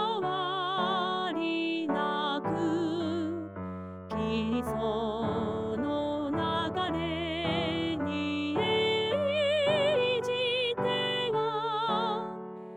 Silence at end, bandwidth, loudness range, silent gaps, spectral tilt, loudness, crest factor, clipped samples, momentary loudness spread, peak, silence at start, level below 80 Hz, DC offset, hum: 0 s; 14 kHz; 4 LU; none; -6 dB/octave; -30 LUFS; 14 dB; under 0.1%; 6 LU; -16 dBFS; 0 s; -58 dBFS; under 0.1%; none